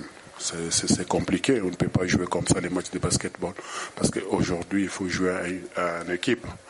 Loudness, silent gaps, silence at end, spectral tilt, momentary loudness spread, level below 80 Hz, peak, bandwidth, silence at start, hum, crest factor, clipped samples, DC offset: -26 LUFS; none; 0 s; -4 dB/octave; 8 LU; -48 dBFS; -8 dBFS; 11.5 kHz; 0 s; none; 18 dB; under 0.1%; under 0.1%